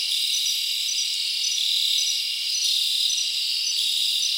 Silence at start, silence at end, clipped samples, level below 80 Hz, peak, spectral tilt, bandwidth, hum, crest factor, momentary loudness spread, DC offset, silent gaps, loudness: 0 s; 0 s; under 0.1%; -78 dBFS; -10 dBFS; 6 dB/octave; 16 kHz; none; 14 dB; 3 LU; under 0.1%; none; -21 LUFS